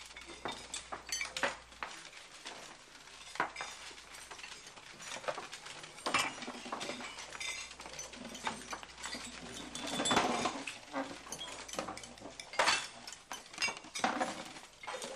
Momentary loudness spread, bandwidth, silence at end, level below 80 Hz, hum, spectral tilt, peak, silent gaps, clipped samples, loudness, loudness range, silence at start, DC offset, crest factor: 15 LU; 15 kHz; 0 s; -68 dBFS; none; -1.5 dB/octave; -16 dBFS; none; under 0.1%; -39 LUFS; 7 LU; 0 s; under 0.1%; 24 dB